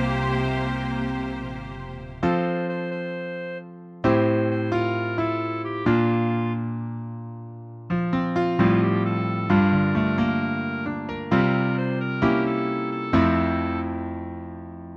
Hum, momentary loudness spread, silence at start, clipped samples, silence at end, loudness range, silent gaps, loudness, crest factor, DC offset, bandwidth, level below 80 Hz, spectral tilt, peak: none; 15 LU; 0 s; under 0.1%; 0 s; 4 LU; none; -24 LUFS; 18 dB; under 0.1%; 7.6 kHz; -44 dBFS; -8.5 dB/octave; -6 dBFS